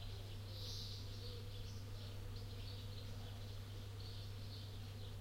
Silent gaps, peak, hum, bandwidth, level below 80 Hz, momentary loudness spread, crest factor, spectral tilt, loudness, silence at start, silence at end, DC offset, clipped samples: none; -36 dBFS; none; 16.5 kHz; -56 dBFS; 3 LU; 14 dB; -5 dB/octave; -51 LUFS; 0 s; 0 s; under 0.1%; under 0.1%